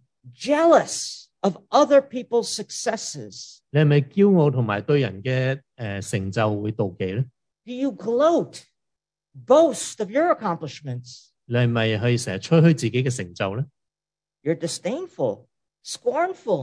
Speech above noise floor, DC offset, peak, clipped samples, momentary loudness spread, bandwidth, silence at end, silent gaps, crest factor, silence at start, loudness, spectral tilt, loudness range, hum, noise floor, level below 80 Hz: over 68 dB; under 0.1%; -4 dBFS; under 0.1%; 15 LU; 11 kHz; 0 s; none; 18 dB; 0.25 s; -22 LUFS; -6 dB/octave; 4 LU; none; under -90 dBFS; -66 dBFS